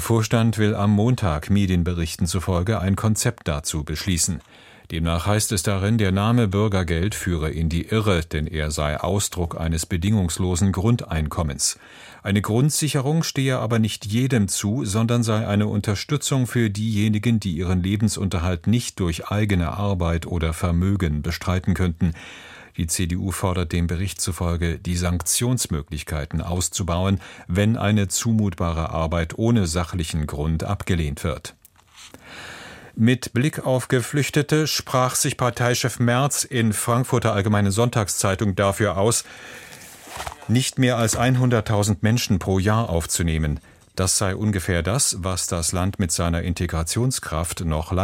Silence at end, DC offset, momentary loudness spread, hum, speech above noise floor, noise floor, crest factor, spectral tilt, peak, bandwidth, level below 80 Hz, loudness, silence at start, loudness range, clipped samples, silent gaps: 0 s; under 0.1%; 7 LU; none; 26 dB; -48 dBFS; 18 dB; -5 dB/octave; -4 dBFS; 16.5 kHz; -36 dBFS; -22 LUFS; 0 s; 3 LU; under 0.1%; none